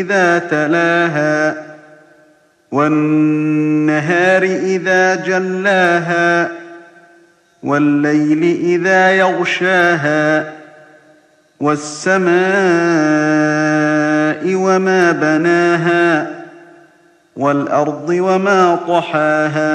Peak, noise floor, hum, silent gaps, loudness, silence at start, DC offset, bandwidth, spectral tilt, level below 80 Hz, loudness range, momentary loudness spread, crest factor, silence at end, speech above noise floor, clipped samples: 0 dBFS; -51 dBFS; none; none; -13 LUFS; 0 s; under 0.1%; 9.4 kHz; -5.5 dB/octave; -66 dBFS; 3 LU; 6 LU; 14 dB; 0 s; 38 dB; under 0.1%